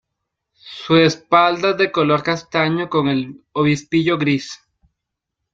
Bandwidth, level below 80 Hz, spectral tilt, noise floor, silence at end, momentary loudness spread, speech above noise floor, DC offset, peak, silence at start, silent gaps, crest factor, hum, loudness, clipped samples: 7.8 kHz; -58 dBFS; -6 dB/octave; -80 dBFS; 1 s; 12 LU; 63 dB; under 0.1%; -2 dBFS; 0.65 s; none; 18 dB; none; -17 LUFS; under 0.1%